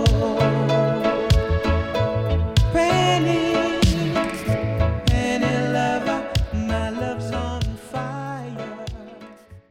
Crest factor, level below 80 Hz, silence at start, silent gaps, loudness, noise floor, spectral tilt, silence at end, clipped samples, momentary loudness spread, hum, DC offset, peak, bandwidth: 16 dB; -30 dBFS; 0 s; none; -21 LUFS; -43 dBFS; -6 dB/octave; 0.1 s; under 0.1%; 11 LU; none; under 0.1%; -6 dBFS; 16 kHz